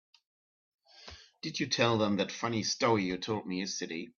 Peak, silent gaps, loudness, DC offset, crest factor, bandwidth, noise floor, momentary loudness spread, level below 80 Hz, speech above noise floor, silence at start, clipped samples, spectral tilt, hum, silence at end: -12 dBFS; none; -31 LUFS; under 0.1%; 20 dB; 7.4 kHz; -53 dBFS; 22 LU; -68 dBFS; 21 dB; 0.95 s; under 0.1%; -4 dB/octave; none; 0.1 s